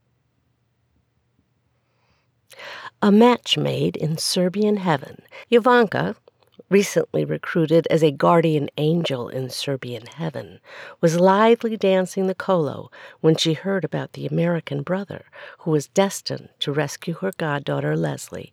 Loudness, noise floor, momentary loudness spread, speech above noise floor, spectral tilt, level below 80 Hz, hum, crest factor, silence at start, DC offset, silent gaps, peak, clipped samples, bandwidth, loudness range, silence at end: -21 LUFS; -68 dBFS; 18 LU; 47 dB; -5.5 dB/octave; -68 dBFS; none; 18 dB; 2.6 s; under 0.1%; none; -4 dBFS; under 0.1%; 16 kHz; 5 LU; 0.1 s